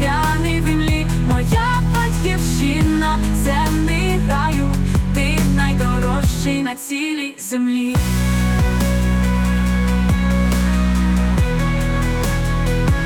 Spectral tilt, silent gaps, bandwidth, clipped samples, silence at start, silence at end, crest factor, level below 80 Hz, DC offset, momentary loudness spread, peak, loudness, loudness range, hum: -6 dB/octave; none; 18 kHz; under 0.1%; 0 s; 0 s; 10 dB; -22 dBFS; under 0.1%; 3 LU; -6 dBFS; -18 LUFS; 2 LU; none